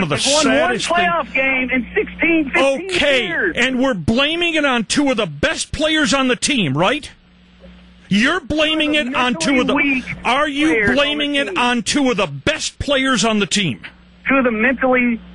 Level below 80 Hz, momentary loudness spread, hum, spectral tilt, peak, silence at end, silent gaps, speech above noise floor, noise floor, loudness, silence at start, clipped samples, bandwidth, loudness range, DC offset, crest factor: -42 dBFS; 4 LU; none; -3.5 dB/octave; -4 dBFS; 0 s; none; 29 dB; -46 dBFS; -16 LUFS; 0 s; under 0.1%; 11.5 kHz; 2 LU; under 0.1%; 12 dB